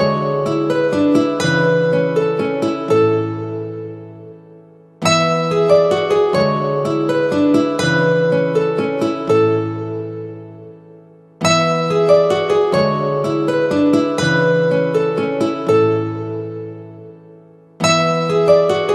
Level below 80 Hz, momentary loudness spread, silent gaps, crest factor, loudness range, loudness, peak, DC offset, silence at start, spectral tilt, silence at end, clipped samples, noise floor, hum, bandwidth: -58 dBFS; 13 LU; none; 16 dB; 4 LU; -16 LUFS; 0 dBFS; under 0.1%; 0 s; -5.5 dB/octave; 0 s; under 0.1%; -44 dBFS; none; 12.5 kHz